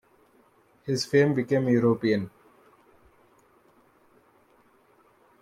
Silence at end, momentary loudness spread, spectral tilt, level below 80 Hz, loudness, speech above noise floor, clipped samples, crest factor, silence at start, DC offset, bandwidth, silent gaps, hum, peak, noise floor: 3.15 s; 12 LU; -6.5 dB/octave; -68 dBFS; -24 LUFS; 38 dB; under 0.1%; 20 dB; 0.85 s; under 0.1%; 14.5 kHz; none; none; -8 dBFS; -62 dBFS